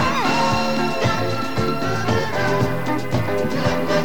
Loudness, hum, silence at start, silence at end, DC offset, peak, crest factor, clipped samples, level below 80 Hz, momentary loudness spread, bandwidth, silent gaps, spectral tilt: -21 LUFS; none; 0 s; 0 s; 5%; -6 dBFS; 16 dB; under 0.1%; -44 dBFS; 4 LU; 19 kHz; none; -5.5 dB/octave